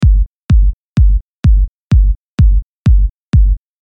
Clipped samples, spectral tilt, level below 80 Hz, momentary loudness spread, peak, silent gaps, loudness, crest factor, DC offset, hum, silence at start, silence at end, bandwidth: under 0.1%; -8.5 dB/octave; -12 dBFS; 3 LU; -2 dBFS; 0.26-0.49 s, 0.73-0.96 s, 1.21-1.43 s, 1.68-1.90 s, 2.16-2.38 s, 2.63-2.85 s, 3.10-3.33 s; -14 LUFS; 10 dB; under 0.1%; none; 0 s; 0.3 s; 5 kHz